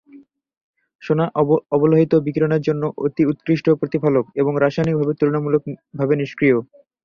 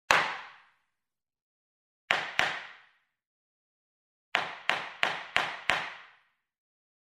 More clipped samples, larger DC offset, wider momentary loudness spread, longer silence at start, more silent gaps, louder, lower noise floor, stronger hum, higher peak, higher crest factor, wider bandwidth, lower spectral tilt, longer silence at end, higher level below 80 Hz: neither; neither; second, 6 LU vs 15 LU; about the same, 0.15 s vs 0.1 s; second, 0.57-0.74 s, 0.95-0.99 s vs 1.42-2.08 s, 3.27-4.32 s; first, -19 LUFS vs -30 LUFS; second, -47 dBFS vs under -90 dBFS; neither; about the same, -2 dBFS vs -2 dBFS; second, 16 dB vs 32 dB; second, 6.8 kHz vs 15.5 kHz; first, -9 dB/octave vs -1 dB/octave; second, 0.4 s vs 1.1 s; first, -56 dBFS vs -70 dBFS